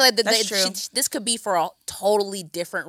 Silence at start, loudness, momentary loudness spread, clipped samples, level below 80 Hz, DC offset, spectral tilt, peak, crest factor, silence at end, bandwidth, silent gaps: 0 s; -22 LUFS; 10 LU; under 0.1%; -68 dBFS; under 0.1%; -1 dB/octave; -2 dBFS; 22 dB; 0 s; 17 kHz; none